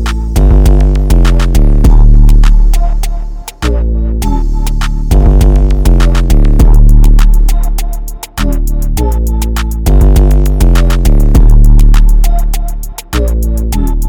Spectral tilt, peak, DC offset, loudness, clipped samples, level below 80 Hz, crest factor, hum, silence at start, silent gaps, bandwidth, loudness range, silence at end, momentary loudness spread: -6.5 dB/octave; 0 dBFS; under 0.1%; -11 LUFS; under 0.1%; -6 dBFS; 6 dB; none; 0 s; none; 16.5 kHz; 3 LU; 0 s; 9 LU